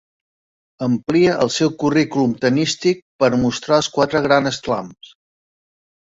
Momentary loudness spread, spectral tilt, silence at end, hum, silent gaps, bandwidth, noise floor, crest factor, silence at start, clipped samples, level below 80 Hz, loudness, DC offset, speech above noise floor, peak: 7 LU; -5 dB/octave; 1.1 s; none; 3.02-3.19 s; 7.8 kHz; under -90 dBFS; 16 dB; 0.8 s; under 0.1%; -52 dBFS; -18 LUFS; under 0.1%; over 73 dB; -2 dBFS